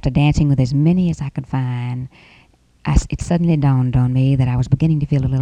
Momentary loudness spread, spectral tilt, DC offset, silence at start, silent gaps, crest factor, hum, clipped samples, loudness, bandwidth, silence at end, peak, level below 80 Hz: 9 LU; -8 dB/octave; under 0.1%; 0.05 s; none; 16 dB; none; under 0.1%; -17 LUFS; 9.2 kHz; 0 s; 0 dBFS; -28 dBFS